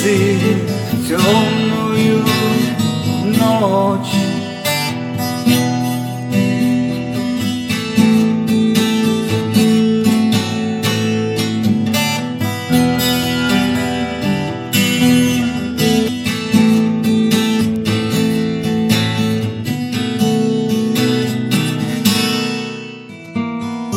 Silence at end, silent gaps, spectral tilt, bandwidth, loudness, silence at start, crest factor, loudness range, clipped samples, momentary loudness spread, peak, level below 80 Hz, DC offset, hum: 0 s; none; -5 dB/octave; 17 kHz; -15 LUFS; 0 s; 14 dB; 2 LU; under 0.1%; 7 LU; 0 dBFS; -50 dBFS; under 0.1%; none